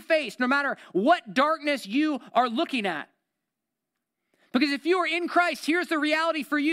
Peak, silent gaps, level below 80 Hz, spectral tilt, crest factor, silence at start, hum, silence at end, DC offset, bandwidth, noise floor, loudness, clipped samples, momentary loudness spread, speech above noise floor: -8 dBFS; none; -80 dBFS; -4 dB/octave; 18 dB; 0 s; none; 0 s; under 0.1%; 15.5 kHz; -85 dBFS; -25 LUFS; under 0.1%; 4 LU; 60 dB